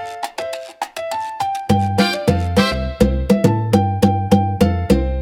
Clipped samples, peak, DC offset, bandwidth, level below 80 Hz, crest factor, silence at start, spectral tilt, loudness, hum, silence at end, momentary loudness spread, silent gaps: under 0.1%; 0 dBFS; under 0.1%; 16.5 kHz; -28 dBFS; 16 dB; 0 s; -6.5 dB/octave; -18 LUFS; none; 0 s; 11 LU; none